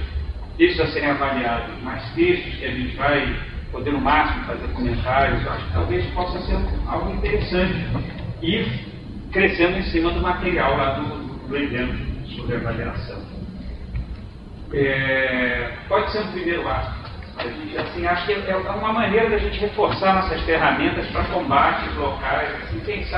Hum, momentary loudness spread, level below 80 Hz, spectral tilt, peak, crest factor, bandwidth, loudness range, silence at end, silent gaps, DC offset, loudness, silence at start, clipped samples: none; 13 LU; -32 dBFS; -8.5 dB/octave; -2 dBFS; 20 dB; 5.8 kHz; 4 LU; 0 s; none; under 0.1%; -22 LUFS; 0 s; under 0.1%